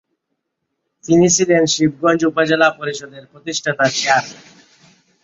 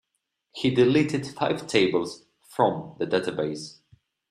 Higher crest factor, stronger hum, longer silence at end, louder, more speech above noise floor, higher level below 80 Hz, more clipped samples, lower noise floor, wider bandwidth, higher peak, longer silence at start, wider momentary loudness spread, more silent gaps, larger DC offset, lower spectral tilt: about the same, 18 dB vs 20 dB; neither; first, 0.9 s vs 0.6 s; first, -15 LUFS vs -25 LUFS; first, 59 dB vs 55 dB; first, -58 dBFS vs -64 dBFS; neither; second, -75 dBFS vs -79 dBFS; second, 8 kHz vs 13 kHz; first, 0 dBFS vs -6 dBFS; first, 1.05 s vs 0.55 s; about the same, 16 LU vs 17 LU; neither; neither; second, -3.5 dB/octave vs -5.5 dB/octave